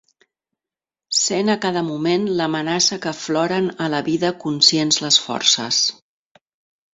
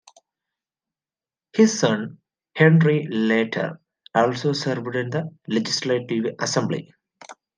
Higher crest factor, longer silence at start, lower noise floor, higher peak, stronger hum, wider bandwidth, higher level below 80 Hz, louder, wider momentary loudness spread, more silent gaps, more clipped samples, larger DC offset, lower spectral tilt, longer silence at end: about the same, 20 dB vs 20 dB; second, 1.1 s vs 1.55 s; about the same, -90 dBFS vs under -90 dBFS; about the same, 0 dBFS vs -2 dBFS; neither; second, 8 kHz vs 9.8 kHz; first, -64 dBFS vs -70 dBFS; first, -18 LUFS vs -22 LUFS; second, 7 LU vs 11 LU; neither; neither; neither; second, -2.5 dB/octave vs -5.5 dB/octave; first, 1 s vs 0.25 s